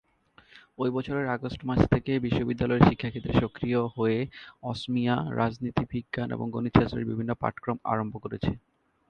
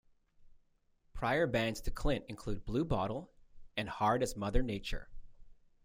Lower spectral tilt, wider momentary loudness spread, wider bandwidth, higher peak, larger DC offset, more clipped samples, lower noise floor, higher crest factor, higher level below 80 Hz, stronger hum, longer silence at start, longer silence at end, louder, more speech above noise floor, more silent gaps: first, -8.5 dB/octave vs -5.5 dB/octave; second, 8 LU vs 11 LU; second, 8.8 kHz vs 16 kHz; first, -2 dBFS vs -16 dBFS; neither; neither; second, -60 dBFS vs -72 dBFS; first, 26 dB vs 20 dB; about the same, -46 dBFS vs -44 dBFS; neither; first, 0.55 s vs 0.4 s; first, 0.5 s vs 0.3 s; first, -28 LUFS vs -36 LUFS; second, 32 dB vs 38 dB; neither